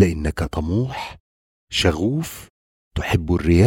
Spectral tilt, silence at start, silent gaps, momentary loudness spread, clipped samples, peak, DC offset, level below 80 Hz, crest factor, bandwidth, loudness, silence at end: -6 dB/octave; 0 s; 1.20-1.67 s, 2.50-2.91 s; 13 LU; under 0.1%; -2 dBFS; under 0.1%; -32 dBFS; 20 dB; 17 kHz; -22 LUFS; 0 s